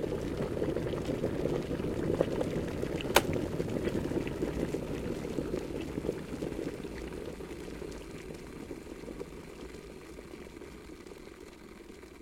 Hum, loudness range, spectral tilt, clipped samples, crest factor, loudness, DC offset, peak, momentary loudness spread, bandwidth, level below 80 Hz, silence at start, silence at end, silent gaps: none; 13 LU; -5.5 dB/octave; under 0.1%; 30 dB; -35 LUFS; under 0.1%; -6 dBFS; 16 LU; 16.5 kHz; -50 dBFS; 0 s; 0 s; none